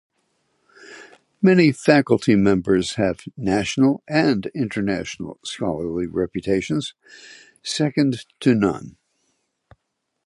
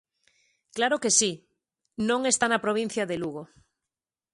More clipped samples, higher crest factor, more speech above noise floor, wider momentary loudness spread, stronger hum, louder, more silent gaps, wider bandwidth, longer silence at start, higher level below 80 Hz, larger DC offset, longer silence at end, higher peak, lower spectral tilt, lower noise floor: neither; about the same, 20 dB vs 22 dB; second, 57 dB vs 64 dB; second, 14 LU vs 19 LU; neither; first, -20 LUFS vs -25 LUFS; neither; about the same, 11.5 kHz vs 11.5 kHz; first, 0.9 s vs 0.75 s; first, -50 dBFS vs -68 dBFS; neither; first, 1.35 s vs 0.9 s; first, 0 dBFS vs -8 dBFS; first, -6 dB/octave vs -2 dB/octave; second, -77 dBFS vs -90 dBFS